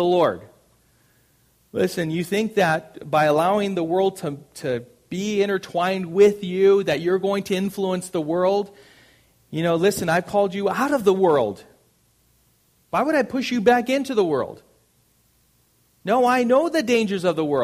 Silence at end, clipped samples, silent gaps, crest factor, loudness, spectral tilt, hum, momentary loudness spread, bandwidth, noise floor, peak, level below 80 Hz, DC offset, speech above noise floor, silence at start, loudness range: 0 s; under 0.1%; none; 18 dB; -21 LUFS; -5.5 dB/octave; none; 10 LU; 15.5 kHz; -62 dBFS; -4 dBFS; -60 dBFS; under 0.1%; 41 dB; 0 s; 3 LU